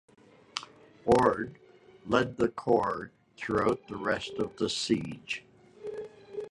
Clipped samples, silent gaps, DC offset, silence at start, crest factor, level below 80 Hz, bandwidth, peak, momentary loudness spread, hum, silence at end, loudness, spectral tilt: under 0.1%; none; under 0.1%; 0.55 s; 22 dB; -58 dBFS; 11.5 kHz; -8 dBFS; 16 LU; none; 0 s; -30 LUFS; -5 dB/octave